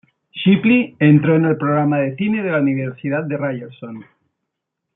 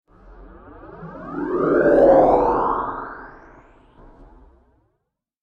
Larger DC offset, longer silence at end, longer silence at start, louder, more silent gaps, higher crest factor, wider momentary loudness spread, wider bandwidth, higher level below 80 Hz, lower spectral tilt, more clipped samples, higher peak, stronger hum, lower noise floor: neither; second, 0.95 s vs 2.1 s; about the same, 0.35 s vs 0.4 s; about the same, -17 LUFS vs -17 LUFS; neither; about the same, 16 dB vs 18 dB; second, 20 LU vs 24 LU; second, 3.9 kHz vs 5.6 kHz; second, -62 dBFS vs -44 dBFS; first, -12 dB/octave vs -9 dB/octave; neither; about the same, -2 dBFS vs -4 dBFS; neither; about the same, -79 dBFS vs -76 dBFS